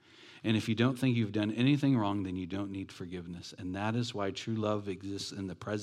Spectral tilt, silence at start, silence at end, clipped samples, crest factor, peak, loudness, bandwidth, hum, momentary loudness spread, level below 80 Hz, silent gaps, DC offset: -6.5 dB/octave; 0.2 s; 0 s; under 0.1%; 18 dB; -14 dBFS; -33 LUFS; 13.5 kHz; none; 13 LU; -74 dBFS; none; under 0.1%